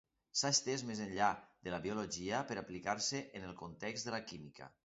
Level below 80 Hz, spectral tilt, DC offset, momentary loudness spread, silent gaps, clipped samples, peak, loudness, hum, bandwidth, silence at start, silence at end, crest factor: -70 dBFS; -2.5 dB/octave; under 0.1%; 15 LU; none; under 0.1%; -20 dBFS; -39 LUFS; none; 7.6 kHz; 0.35 s; 0.15 s; 22 dB